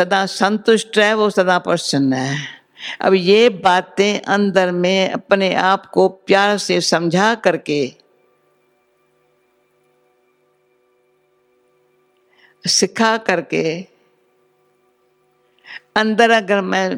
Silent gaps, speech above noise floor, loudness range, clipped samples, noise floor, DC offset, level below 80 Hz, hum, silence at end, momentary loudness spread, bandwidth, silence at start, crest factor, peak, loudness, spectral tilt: none; 45 dB; 8 LU; under 0.1%; -61 dBFS; under 0.1%; -66 dBFS; 50 Hz at -60 dBFS; 0 s; 9 LU; 15 kHz; 0 s; 18 dB; 0 dBFS; -16 LUFS; -4 dB/octave